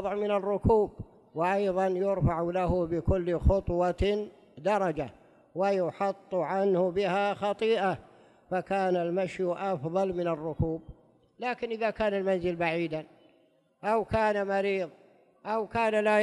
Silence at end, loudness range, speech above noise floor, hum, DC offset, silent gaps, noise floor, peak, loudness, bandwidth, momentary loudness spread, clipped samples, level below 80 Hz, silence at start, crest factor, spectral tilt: 0 s; 3 LU; 38 dB; none; under 0.1%; none; -66 dBFS; -12 dBFS; -29 LUFS; 11.5 kHz; 8 LU; under 0.1%; -42 dBFS; 0 s; 18 dB; -7.5 dB/octave